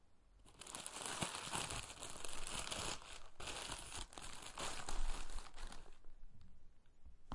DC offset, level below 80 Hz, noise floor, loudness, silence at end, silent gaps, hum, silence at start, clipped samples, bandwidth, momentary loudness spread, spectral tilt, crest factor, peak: under 0.1%; -50 dBFS; -65 dBFS; -47 LUFS; 0 s; none; none; 0.05 s; under 0.1%; 11.5 kHz; 22 LU; -2 dB/octave; 20 dB; -24 dBFS